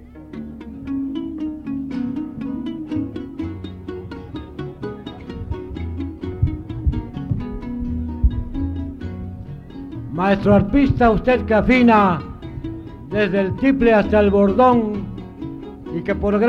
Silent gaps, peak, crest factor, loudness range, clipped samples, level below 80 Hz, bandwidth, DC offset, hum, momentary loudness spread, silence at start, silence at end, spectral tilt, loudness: none; -2 dBFS; 18 dB; 12 LU; under 0.1%; -32 dBFS; 7 kHz; under 0.1%; none; 18 LU; 0 s; 0 s; -9 dB/octave; -20 LUFS